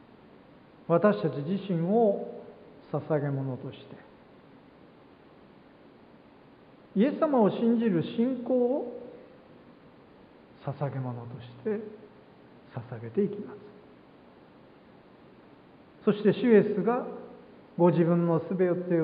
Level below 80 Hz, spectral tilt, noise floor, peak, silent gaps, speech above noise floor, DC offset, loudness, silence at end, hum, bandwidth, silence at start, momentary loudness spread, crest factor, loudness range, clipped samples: -72 dBFS; -12 dB/octave; -55 dBFS; -8 dBFS; none; 28 dB; under 0.1%; -28 LUFS; 0 s; none; 5 kHz; 0.9 s; 20 LU; 20 dB; 12 LU; under 0.1%